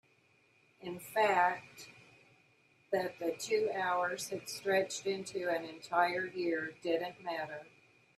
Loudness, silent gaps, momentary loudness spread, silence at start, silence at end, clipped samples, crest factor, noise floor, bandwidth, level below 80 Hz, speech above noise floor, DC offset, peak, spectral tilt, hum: -35 LUFS; none; 14 LU; 0.8 s; 0.5 s; under 0.1%; 20 dB; -70 dBFS; 15.5 kHz; -82 dBFS; 35 dB; under 0.1%; -16 dBFS; -3.5 dB/octave; none